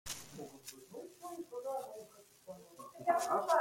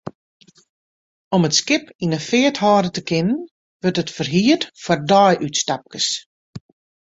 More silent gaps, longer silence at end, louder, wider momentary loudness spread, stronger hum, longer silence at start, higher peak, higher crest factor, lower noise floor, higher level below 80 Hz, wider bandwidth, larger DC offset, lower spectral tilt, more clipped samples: second, none vs 0.15-0.40 s, 0.69-1.31 s, 1.95-1.99 s, 3.51-3.80 s, 6.26-6.53 s; second, 0 s vs 0.45 s; second, -39 LUFS vs -18 LUFS; first, 21 LU vs 9 LU; neither; about the same, 0.05 s vs 0.05 s; second, -18 dBFS vs -2 dBFS; about the same, 22 dB vs 18 dB; second, -57 dBFS vs under -90 dBFS; second, -74 dBFS vs -58 dBFS; first, 16.5 kHz vs 8 kHz; neither; about the same, -3 dB/octave vs -4 dB/octave; neither